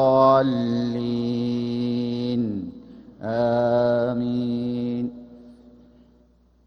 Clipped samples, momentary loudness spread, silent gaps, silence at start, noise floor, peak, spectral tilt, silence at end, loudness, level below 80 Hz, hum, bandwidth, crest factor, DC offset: under 0.1%; 14 LU; none; 0 s; -58 dBFS; -6 dBFS; -8.5 dB/octave; 1.15 s; -23 LUFS; -56 dBFS; none; 6.2 kHz; 18 dB; under 0.1%